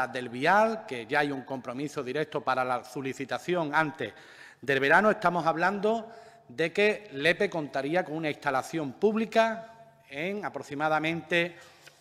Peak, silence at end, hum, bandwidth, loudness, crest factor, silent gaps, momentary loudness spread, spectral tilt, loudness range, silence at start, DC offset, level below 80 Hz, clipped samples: -8 dBFS; 0.35 s; none; 15.5 kHz; -28 LUFS; 22 dB; none; 12 LU; -5 dB/octave; 4 LU; 0 s; under 0.1%; -72 dBFS; under 0.1%